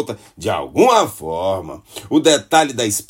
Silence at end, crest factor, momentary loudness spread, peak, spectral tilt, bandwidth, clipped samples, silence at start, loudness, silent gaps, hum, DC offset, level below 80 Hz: 0.05 s; 16 dB; 14 LU; 0 dBFS; -3.5 dB/octave; 16.5 kHz; under 0.1%; 0 s; -16 LUFS; none; none; under 0.1%; -54 dBFS